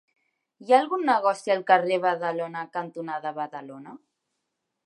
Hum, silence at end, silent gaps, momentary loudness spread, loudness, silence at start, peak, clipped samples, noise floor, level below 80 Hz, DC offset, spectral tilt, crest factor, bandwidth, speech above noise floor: none; 0.9 s; none; 17 LU; -25 LUFS; 0.6 s; -4 dBFS; under 0.1%; -81 dBFS; -86 dBFS; under 0.1%; -5 dB/octave; 22 dB; 11.5 kHz; 56 dB